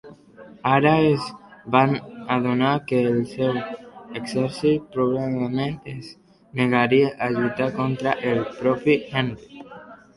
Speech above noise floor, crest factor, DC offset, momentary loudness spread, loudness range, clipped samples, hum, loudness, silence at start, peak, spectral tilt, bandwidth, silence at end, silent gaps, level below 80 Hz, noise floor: 25 dB; 20 dB; under 0.1%; 18 LU; 4 LU; under 0.1%; none; -22 LUFS; 0.05 s; -4 dBFS; -7 dB/octave; 11.5 kHz; 0.2 s; none; -58 dBFS; -46 dBFS